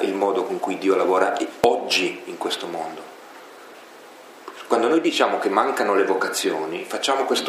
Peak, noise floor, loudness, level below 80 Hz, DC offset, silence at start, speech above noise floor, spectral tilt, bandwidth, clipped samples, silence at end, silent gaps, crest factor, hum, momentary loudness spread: 0 dBFS; -44 dBFS; -21 LUFS; -68 dBFS; under 0.1%; 0 s; 22 dB; -3 dB/octave; 15.5 kHz; under 0.1%; 0 s; none; 22 dB; none; 22 LU